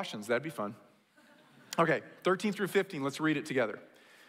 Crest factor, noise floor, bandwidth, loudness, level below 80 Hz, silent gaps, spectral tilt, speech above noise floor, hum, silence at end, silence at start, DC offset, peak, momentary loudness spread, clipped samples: 20 dB; -63 dBFS; 16 kHz; -33 LUFS; -84 dBFS; none; -5 dB/octave; 30 dB; none; 0.4 s; 0 s; under 0.1%; -14 dBFS; 9 LU; under 0.1%